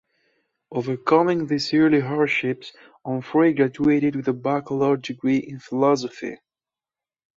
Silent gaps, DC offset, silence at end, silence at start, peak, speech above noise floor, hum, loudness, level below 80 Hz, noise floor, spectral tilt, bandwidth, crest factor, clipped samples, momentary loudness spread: none; under 0.1%; 1.05 s; 0.7 s; -4 dBFS; over 69 dB; none; -22 LUFS; -62 dBFS; under -90 dBFS; -6.5 dB/octave; 7.6 kHz; 18 dB; under 0.1%; 13 LU